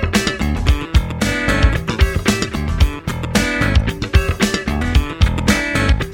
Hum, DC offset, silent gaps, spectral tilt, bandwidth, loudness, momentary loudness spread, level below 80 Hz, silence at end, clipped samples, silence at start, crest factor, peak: none; under 0.1%; none; -5 dB/octave; 16.5 kHz; -17 LUFS; 3 LU; -20 dBFS; 0 s; under 0.1%; 0 s; 16 dB; 0 dBFS